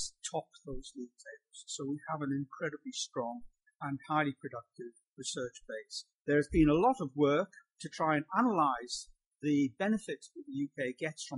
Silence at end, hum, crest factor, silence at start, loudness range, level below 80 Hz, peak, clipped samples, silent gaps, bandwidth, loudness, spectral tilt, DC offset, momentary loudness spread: 0 s; none; 20 dB; 0 s; 9 LU; -54 dBFS; -16 dBFS; under 0.1%; 5.07-5.16 s, 6.14-6.25 s, 9.26-9.31 s; 11.5 kHz; -34 LUFS; -5 dB/octave; under 0.1%; 18 LU